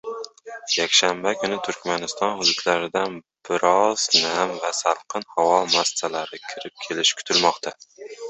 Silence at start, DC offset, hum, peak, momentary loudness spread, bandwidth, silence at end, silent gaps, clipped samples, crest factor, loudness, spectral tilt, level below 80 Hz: 0.05 s; under 0.1%; none; -2 dBFS; 16 LU; 8.4 kHz; 0 s; none; under 0.1%; 22 dB; -21 LUFS; -1.5 dB/octave; -68 dBFS